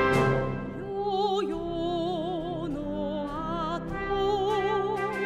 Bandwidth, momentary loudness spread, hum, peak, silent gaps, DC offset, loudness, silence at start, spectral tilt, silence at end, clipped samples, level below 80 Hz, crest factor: 13.5 kHz; 6 LU; none; -12 dBFS; none; under 0.1%; -29 LUFS; 0 s; -6.5 dB/octave; 0 s; under 0.1%; -46 dBFS; 16 dB